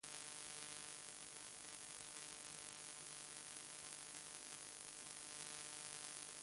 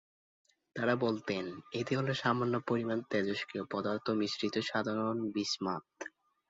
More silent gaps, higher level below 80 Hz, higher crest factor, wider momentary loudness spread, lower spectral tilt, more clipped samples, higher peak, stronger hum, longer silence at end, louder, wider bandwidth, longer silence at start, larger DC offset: neither; second, -84 dBFS vs -72 dBFS; first, 26 dB vs 20 dB; second, 3 LU vs 8 LU; second, 0 dB/octave vs -4 dB/octave; neither; second, -30 dBFS vs -16 dBFS; neither; second, 0 s vs 0.4 s; second, -52 LUFS vs -34 LUFS; first, 11.5 kHz vs 7.6 kHz; second, 0.05 s vs 0.75 s; neither